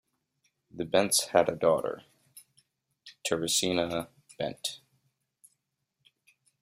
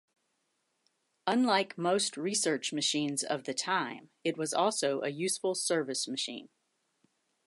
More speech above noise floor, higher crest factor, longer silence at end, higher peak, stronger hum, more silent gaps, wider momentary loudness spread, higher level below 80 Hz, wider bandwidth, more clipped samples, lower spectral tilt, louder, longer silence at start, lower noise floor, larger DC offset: first, 53 dB vs 47 dB; first, 24 dB vs 18 dB; first, 1.85 s vs 1 s; first, -8 dBFS vs -14 dBFS; neither; neither; first, 14 LU vs 7 LU; first, -68 dBFS vs -86 dBFS; first, 16 kHz vs 12 kHz; neither; about the same, -3 dB/octave vs -2.5 dB/octave; first, -28 LUFS vs -31 LUFS; second, 0.75 s vs 1.25 s; about the same, -81 dBFS vs -79 dBFS; neither